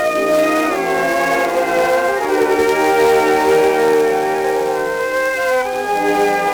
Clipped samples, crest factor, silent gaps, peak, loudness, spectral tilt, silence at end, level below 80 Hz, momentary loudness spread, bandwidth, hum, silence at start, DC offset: under 0.1%; 12 dB; none; -2 dBFS; -15 LUFS; -3.5 dB/octave; 0 s; -48 dBFS; 5 LU; over 20 kHz; none; 0 s; under 0.1%